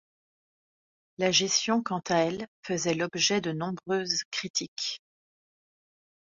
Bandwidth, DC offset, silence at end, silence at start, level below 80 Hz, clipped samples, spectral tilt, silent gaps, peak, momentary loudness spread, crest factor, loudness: 7.8 kHz; under 0.1%; 1.35 s; 1.2 s; -70 dBFS; under 0.1%; -3 dB/octave; 2.48-2.63 s, 4.25-4.32 s, 4.50-4.54 s, 4.68-4.76 s; -10 dBFS; 9 LU; 20 dB; -28 LUFS